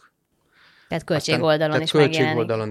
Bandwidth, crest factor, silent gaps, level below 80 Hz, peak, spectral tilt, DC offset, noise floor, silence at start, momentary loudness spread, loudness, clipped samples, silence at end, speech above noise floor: 13 kHz; 18 dB; none; -60 dBFS; -4 dBFS; -5.5 dB/octave; under 0.1%; -65 dBFS; 0.9 s; 9 LU; -20 LUFS; under 0.1%; 0 s; 45 dB